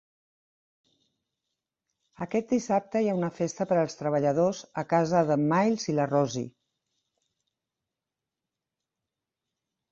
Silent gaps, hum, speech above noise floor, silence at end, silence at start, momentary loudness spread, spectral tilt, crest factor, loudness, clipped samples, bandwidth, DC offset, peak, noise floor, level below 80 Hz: none; none; 62 dB; 3.45 s; 2.2 s; 7 LU; -6.5 dB/octave; 20 dB; -27 LUFS; under 0.1%; 8 kHz; under 0.1%; -10 dBFS; -88 dBFS; -70 dBFS